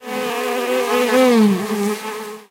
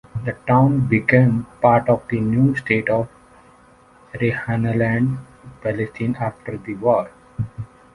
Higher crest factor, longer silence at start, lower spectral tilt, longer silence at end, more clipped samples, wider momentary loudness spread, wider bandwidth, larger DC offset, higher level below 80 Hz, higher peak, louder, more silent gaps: about the same, 16 dB vs 18 dB; second, 0 s vs 0.15 s; second, -5 dB/octave vs -9.5 dB/octave; second, 0.1 s vs 0.3 s; neither; about the same, 12 LU vs 14 LU; first, 16 kHz vs 10.5 kHz; neither; second, -66 dBFS vs -48 dBFS; about the same, -2 dBFS vs -2 dBFS; about the same, -17 LUFS vs -19 LUFS; neither